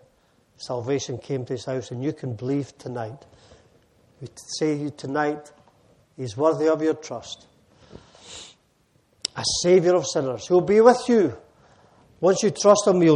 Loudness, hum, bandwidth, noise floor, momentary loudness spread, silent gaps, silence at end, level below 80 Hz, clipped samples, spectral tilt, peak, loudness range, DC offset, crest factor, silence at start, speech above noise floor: -22 LUFS; none; 11 kHz; -64 dBFS; 23 LU; none; 0 s; -62 dBFS; under 0.1%; -5 dB/octave; -2 dBFS; 11 LU; under 0.1%; 22 dB; 0.6 s; 42 dB